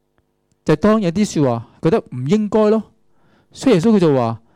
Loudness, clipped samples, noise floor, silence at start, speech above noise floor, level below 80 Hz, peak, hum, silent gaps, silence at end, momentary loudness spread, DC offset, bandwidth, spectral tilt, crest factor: -17 LUFS; under 0.1%; -65 dBFS; 0.65 s; 49 dB; -48 dBFS; -6 dBFS; none; none; 0.2 s; 7 LU; under 0.1%; 11 kHz; -7 dB/octave; 12 dB